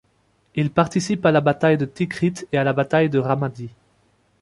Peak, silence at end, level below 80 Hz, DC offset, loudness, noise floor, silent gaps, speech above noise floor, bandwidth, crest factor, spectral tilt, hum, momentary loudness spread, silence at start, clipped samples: -2 dBFS; 0.7 s; -56 dBFS; under 0.1%; -20 LUFS; -63 dBFS; none; 43 dB; 11.5 kHz; 20 dB; -6.5 dB/octave; none; 10 LU; 0.55 s; under 0.1%